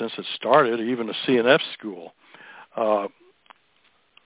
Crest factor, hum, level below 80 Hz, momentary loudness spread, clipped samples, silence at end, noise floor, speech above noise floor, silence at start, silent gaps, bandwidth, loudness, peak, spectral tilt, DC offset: 22 dB; none; -74 dBFS; 17 LU; under 0.1%; 1.15 s; -63 dBFS; 41 dB; 0 s; none; 4 kHz; -22 LUFS; -4 dBFS; -8.5 dB/octave; under 0.1%